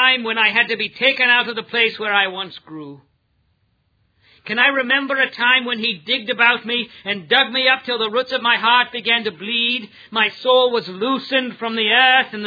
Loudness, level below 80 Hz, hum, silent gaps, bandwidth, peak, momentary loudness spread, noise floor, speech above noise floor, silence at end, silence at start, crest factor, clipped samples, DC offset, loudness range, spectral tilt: -16 LUFS; -70 dBFS; none; none; 5 kHz; 0 dBFS; 9 LU; -64 dBFS; 46 dB; 0 s; 0 s; 18 dB; under 0.1%; under 0.1%; 4 LU; -4.5 dB/octave